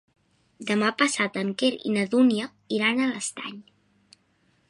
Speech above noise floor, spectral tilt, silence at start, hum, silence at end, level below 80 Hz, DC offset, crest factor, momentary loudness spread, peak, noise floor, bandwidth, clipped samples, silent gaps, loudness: 42 dB; -4 dB/octave; 0.6 s; none; 1.1 s; -74 dBFS; under 0.1%; 20 dB; 11 LU; -6 dBFS; -66 dBFS; 11.5 kHz; under 0.1%; none; -24 LUFS